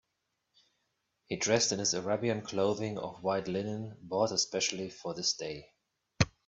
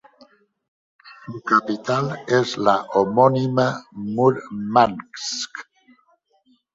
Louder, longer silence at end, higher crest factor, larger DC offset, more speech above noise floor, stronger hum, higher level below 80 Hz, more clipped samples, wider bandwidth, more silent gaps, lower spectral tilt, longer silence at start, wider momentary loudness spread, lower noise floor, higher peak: second, -32 LUFS vs -20 LUFS; second, 0.2 s vs 1.15 s; about the same, 24 dB vs 20 dB; neither; first, 50 dB vs 42 dB; neither; about the same, -60 dBFS vs -62 dBFS; neither; about the same, 8.4 kHz vs 7.8 kHz; neither; second, -3.5 dB/octave vs -5.5 dB/octave; first, 1.3 s vs 1.05 s; second, 11 LU vs 14 LU; first, -83 dBFS vs -62 dBFS; second, -10 dBFS vs -2 dBFS